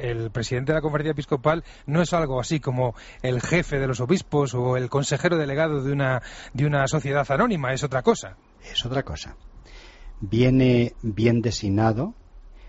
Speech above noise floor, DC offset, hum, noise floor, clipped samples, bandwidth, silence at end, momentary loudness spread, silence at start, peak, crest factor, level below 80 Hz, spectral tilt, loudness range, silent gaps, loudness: 22 dB; under 0.1%; none; -45 dBFS; under 0.1%; 8 kHz; 0 s; 7 LU; 0 s; -6 dBFS; 18 dB; -42 dBFS; -5.5 dB/octave; 2 LU; none; -24 LUFS